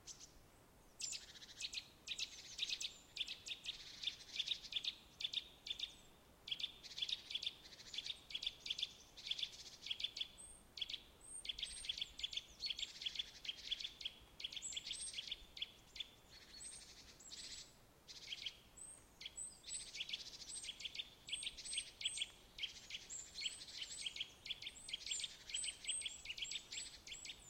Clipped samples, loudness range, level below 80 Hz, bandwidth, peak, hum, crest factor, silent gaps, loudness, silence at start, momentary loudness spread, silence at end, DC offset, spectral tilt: under 0.1%; 5 LU; -72 dBFS; 16.5 kHz; -30 dBFS; none; 20 dB; none; -46 LUFS; 0 s; 11 LU; 0 s; under 0.1%; 1 dB/octave